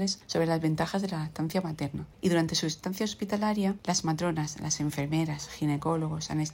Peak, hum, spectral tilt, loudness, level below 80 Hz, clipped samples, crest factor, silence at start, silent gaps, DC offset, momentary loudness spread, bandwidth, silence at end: -14 dBFS; none; -5 dB/octave; -30 LUFS; -58 dBFS; under 0.1%; 16 dB; 0 s; none; under 0.1%; 5 LU; 16.5 kHz; 0 s